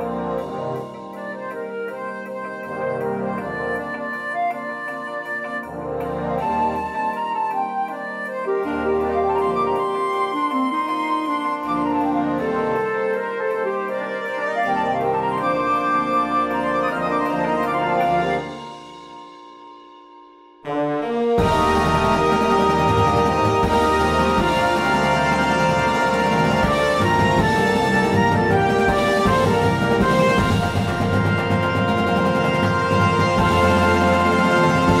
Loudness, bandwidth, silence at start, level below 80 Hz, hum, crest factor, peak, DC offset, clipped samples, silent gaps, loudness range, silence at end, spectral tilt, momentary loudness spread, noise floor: -20 LUFS; 16 kHz; 0 s; -40 dBFS; none; 16 dB; -4 dBFS; under 0.1%; under 0.1%; none; 8 LU; 0 s; -6 dB/octave; 11 LU; -46 dBFS